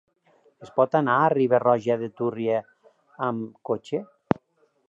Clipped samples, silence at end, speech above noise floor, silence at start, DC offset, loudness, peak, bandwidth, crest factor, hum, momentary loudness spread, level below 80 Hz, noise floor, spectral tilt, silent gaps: under 0.1%; 0.85 s; 43 dB; 0.6 s; under 0.1%; -25 LUFS; -2 dBFS; 8 kHz; 24 dB; none; 10 LU; -64 dBFS; -67 dBFS; -8 dB/octave; none